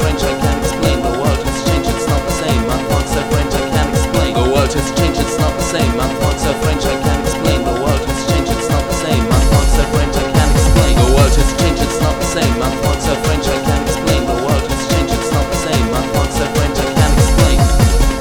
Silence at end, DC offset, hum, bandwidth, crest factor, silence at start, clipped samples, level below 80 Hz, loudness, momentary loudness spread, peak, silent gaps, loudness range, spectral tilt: 0 s; 0.2%; none; over 20 kHz; 14 dB; 0 s; under 0.1%; -18 dBFS; -14 LUFS; 4 LU; 0 dBFS; none; 3 LU; -5 dB/octave